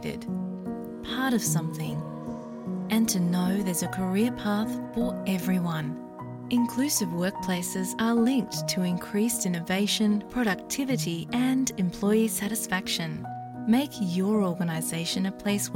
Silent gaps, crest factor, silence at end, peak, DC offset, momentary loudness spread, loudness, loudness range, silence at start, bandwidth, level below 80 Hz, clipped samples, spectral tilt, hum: none; 14 dB; 0 s; -12 dBFS; under 0.1%; 10 LU; -27 LUFS; 2 LU; 0 s; 17 kHz; -58 dBFS; under 0.1%; -4.5 dB/octave; none